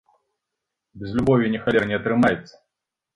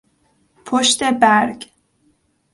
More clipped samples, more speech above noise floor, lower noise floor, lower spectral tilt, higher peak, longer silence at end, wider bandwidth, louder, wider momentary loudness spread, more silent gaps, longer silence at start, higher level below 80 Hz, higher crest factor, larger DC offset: neither; first, 63 dB vs 46 dB; first, -84 dBFS vs -62 dBFS; first, -7.5 dB/octave vs -2 dB/octave; second, -6 dBFS vs 0 dBFS; second, 0.75 s vs 0.9 s; about the same, 10.5 kHz vs 11.5 kHz; second, -21 LUFS vs -15 LUFS; about the same, 10 LU vs 10 LU; neither; first, 0.95 s vs 0.65 s; first, -50 dBFS vs -60 dBFS; about the same, 18 dB vs 18 dB; neither